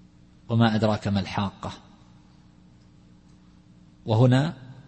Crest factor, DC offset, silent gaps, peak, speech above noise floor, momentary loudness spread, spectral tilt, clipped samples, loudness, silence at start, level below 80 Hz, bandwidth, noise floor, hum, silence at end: 20 dB; under 0.1%; none; -6 dBFS; 31 dB; 18 LU; -7.5 dB/octave; under 0.1%; -24 LUFS; 0.5 s; -56 dBFS; 8.6 kHz; -54 dBFS; 60 Hz at -55 dBFS; 0.05 s